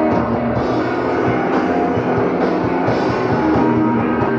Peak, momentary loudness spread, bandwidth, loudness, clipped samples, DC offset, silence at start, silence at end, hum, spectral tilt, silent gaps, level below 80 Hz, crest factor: -4 dBFS; 3 LU; 7.2 kHz; -17 LUFS; under 0.1%; under 0.1%; 0 s; 0 s; none; -8 dB/octave; none; -40 dBFS; 12 dB